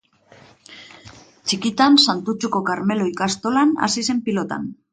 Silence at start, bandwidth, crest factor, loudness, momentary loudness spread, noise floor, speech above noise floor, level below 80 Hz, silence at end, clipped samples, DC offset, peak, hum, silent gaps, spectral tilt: 0.7 s; 9.4 kHz; 20 dB; -19 LUFS; 14 LU; -50 dBFS; 31 dB; -62 dBFS; 0.2 s; under 0.1%; under 0.1%; -2 dBFS; none; none; -3.5 dB/octave